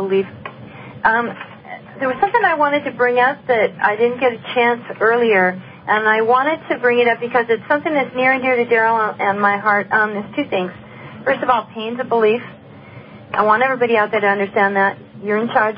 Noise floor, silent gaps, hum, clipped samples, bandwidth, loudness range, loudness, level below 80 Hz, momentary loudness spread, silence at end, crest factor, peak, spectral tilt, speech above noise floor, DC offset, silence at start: -38 dBFS; none; none; under 0.1%; 5.2 kHz; 3 LU; -17 LUFS; -58 dBFS; 12 LU; 0 s; 16 dB; 0 dBFS; -10 dB/octave; 22 dB; under 0.1%; 0 s